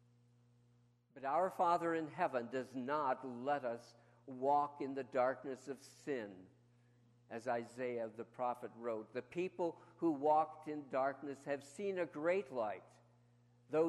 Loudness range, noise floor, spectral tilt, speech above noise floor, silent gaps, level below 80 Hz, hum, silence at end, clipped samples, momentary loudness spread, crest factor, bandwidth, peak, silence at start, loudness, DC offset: 6 LU; -72 dBFS; -6.5 dB/octave; 32 dB; none; -88 dBFS; 60 Hz at -70 dBFS; 0 s; under 0.1%; 12 LU; 18 dB; 13 kHz; -22 dBFS; 1.15 s; -40 LUFS; under 0.1%